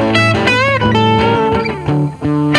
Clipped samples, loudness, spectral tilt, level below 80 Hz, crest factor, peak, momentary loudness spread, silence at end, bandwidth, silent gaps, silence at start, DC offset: under 0.1%; -13 LUFS; -6 dB/octave; -36 dBFS; 12 dB; 0 dBFS; 5 LU; 0 s; 11 kHz; none; 0 s; under 0.1%